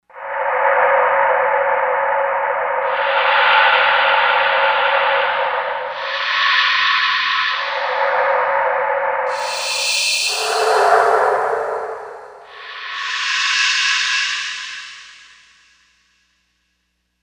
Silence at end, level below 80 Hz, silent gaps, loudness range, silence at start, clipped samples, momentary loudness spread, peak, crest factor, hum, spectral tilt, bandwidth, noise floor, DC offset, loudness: 2.1 s; -64 dBFS; none; 4 LU; 0.15 s; under 0.1%; 12 LU; 0 dBFS; 18 dB; none; 1 dB/octave; over 20 kHz; -69 dBFS; under 0.1%; -16 LUFS